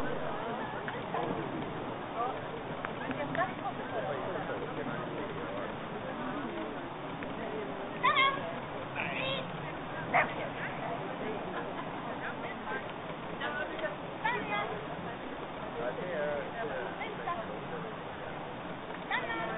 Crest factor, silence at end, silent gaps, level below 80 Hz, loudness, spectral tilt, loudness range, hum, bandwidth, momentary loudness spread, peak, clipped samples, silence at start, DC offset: 22 dB; 0 s; none; -60 dBFS; -36 LUFS; -3 dB/octave; 5 LU; none; 4.1 kHz; 8 LU; -14 dBFS; under 0.1%; 0 s; under 0.1%